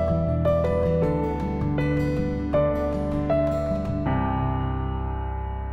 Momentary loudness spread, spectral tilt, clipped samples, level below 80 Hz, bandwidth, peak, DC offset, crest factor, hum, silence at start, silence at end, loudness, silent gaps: 6 LU; -9.5 dB/octave; under 0.1%; -32 dBFS; 8 kHz; -10 dBFS; under 0.1%; 14 dB; none; 0 s; 0 s; -25 LUFS; none